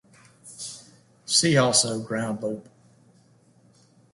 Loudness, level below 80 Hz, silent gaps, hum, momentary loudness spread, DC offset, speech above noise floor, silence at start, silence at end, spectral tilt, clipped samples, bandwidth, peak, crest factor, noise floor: -22 LUFS; -66 dBFS; none; none; 24 LU; under 0.1%; 35 dB; 0.45 s; 1.5 s; -3 dB/octave; under 0.1%; 11.5 kHz; -4 dBFS; 22 dB; -59 dBFS